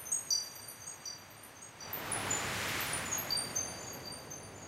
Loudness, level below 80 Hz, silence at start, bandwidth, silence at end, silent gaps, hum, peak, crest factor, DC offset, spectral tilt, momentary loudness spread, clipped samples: -36 LUFS; -64 dBFS; 0 s; 16 kHz; 0 s; none; none; -20 dBFS; 20 dB; under 0.1%; -1 dB/octave; 14 LU; under 0.1%